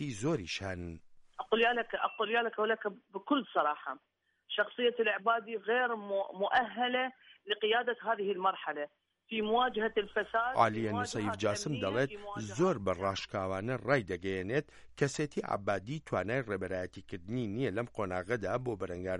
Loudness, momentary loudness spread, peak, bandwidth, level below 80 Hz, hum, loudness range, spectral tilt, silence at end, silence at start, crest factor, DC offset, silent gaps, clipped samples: -34 LUFS; 10 LU; -12 dBFS; 11.5 kHz; -64 dBFS; none; 3 LU; -5 dB/octave; 0 s; 0 s; 22 dB; under 0.1%; none; under 0.1%